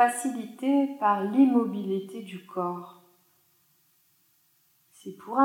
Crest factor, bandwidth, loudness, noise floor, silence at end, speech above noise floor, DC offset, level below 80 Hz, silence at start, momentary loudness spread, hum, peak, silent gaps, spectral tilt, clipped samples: 20 dB; 16 kHz; -26 LUFS; -67 dBFS; 0 s; 41 dB; under 0.1%; under -90 dBFS; 0 s; 21 LU; none; -8 dBFS; none; -5.5 dB/octave; under 0.1%